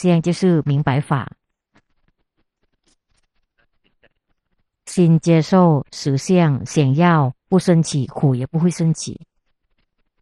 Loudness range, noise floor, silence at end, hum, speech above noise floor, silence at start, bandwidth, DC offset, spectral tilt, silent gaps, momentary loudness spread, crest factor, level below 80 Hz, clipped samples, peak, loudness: 10 LU; -69 dBFS; 1.05 s; none; 53 dB; 0 s; 11 kHz; under 0.1%; -7 dB/octave; none; 9 LU; 18 dB; -54 dBFS; under 0.1%; -2 dBFS; -17 LUFS